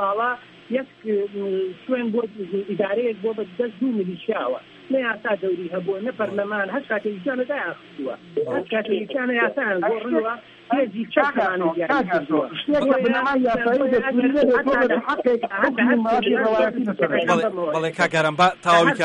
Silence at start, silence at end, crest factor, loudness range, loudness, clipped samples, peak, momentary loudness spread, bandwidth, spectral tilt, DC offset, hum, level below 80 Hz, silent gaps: 0 s; 0 s; 18 dB; 6 LU; -22 LUFS; under 0.1%; -4 dBFS; 9 LU; 10.5 kHz; -5.5 dB/octave; under 0.1%; none; -60 dBFS; none